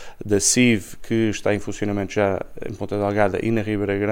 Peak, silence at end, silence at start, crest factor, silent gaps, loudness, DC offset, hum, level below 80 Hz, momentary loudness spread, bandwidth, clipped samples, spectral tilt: -4 dBFS; 0 s; 0 s; 18 dB; none; -21 LUFS; under 0.1%; none; -46 dBFS; 9 LU; 16.5 kHz; under 0.1%; -4.5 dB/octave